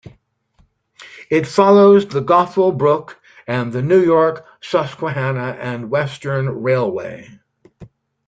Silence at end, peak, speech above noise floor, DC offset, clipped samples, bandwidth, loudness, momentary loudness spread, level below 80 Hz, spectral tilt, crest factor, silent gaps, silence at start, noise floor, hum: 0.4 s; -2 dBFS; 42 dB; under 0.1%; under 0.1%; 8.6 kHz; -16 LUFS; 13 LU; -58 dBFS; -7.5 dB/octave; 16 dB; none; 0.05 s; -58 dBFS; none